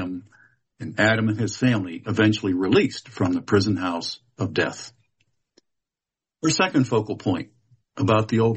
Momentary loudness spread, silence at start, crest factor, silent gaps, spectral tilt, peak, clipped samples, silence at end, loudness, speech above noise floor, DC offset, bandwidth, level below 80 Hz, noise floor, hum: 13 LU; 0 s; 18 dB; none; -5.5 dB/octave; -6 dBFS; under 0.1%; 0 s; -23 LUFS; 68 dB; under 0.1%; 8.4 kHz; -58 dBFS; -89 dBFS; none